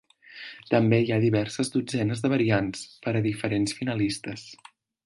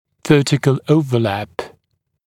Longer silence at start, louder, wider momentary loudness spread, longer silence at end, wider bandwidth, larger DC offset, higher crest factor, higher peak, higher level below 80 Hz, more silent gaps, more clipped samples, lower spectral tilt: about the same, 0.3 s vs 0.25 s; second, -26 LUFS vs -16 LUFS; about the same, 17 LU vs 15 LU; about the same, 0.5 s vs 0.6 s; second, 11.5 kHz vs 14.5 kHz; neither; about the same, 20 dB vs 18 dB; second, -6 dBFS vs 0 dBFS; about the same, -58 dBFS vs -54 dBFS; neither; neither; about the same, -6 dB/octave vs -6.5 dB/octave